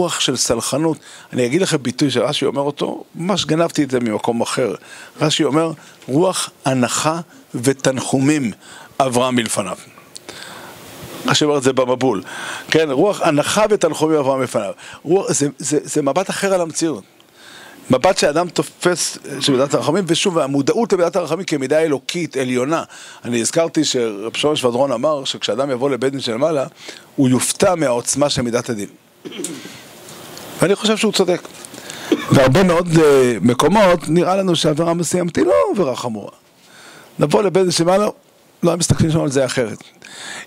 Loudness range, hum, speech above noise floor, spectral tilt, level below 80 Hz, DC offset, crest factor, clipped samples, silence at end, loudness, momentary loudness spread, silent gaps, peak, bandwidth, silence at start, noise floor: 5 LU; none; 27 dB; -4.5 dB/octave; -48 dBFS; under 0.1%; 18 dB; under 0.1%; 0 s; -17 LUFS; 17 LU; none; 0 dBFS; 16 kHz; 0 s; -44 dBFS